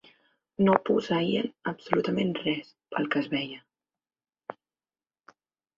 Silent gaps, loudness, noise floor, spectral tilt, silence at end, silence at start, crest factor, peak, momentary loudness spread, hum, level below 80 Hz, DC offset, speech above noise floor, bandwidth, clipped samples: none; -28 LUFS; under -90 dBFS; -7 dB/octave; 1.25 s; 0.6 s; 28 dB; -2 dBFS; 21 LU; none; -68 dBFS; under 0.1%; over 63 dB; 7.4 kHz; under 0.1%